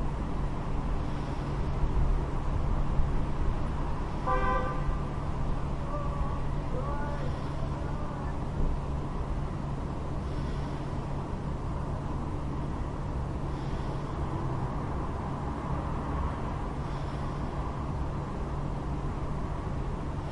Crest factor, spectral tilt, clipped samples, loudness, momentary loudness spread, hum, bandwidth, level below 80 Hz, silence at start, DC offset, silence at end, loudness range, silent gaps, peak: 18 dB; -8 dB/octave; under 0.1%; -34 LUFS; 3 LU; none; 10.5 kHz; -34 dBFS; 0 s; under 0.1%; 0 s; 3 LU; none; -12 dBFS